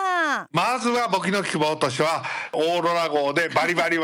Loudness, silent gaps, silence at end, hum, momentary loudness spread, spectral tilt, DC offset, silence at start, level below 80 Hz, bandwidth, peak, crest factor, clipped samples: -22 LUFS; none; 0 s; none; 3 LU; -4 dB/octave; under 0.1%; 0 s; -66 dBFS; 17 kHz; -10 dBFS; 12 dB; under 0.1%